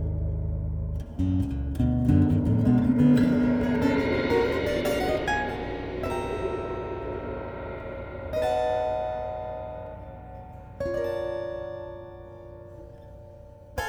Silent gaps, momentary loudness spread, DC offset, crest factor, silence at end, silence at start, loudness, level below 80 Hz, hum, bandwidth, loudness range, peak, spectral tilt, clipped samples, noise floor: none; 21 LU; under 0.1%; 18 dB; 0 s; 0 s; -27 LUFS; -38 dBFS; none; 20 kHz; 12 LU; -10 dBFS; -7.5 dB/octave; under 0.1%; -46 dBFS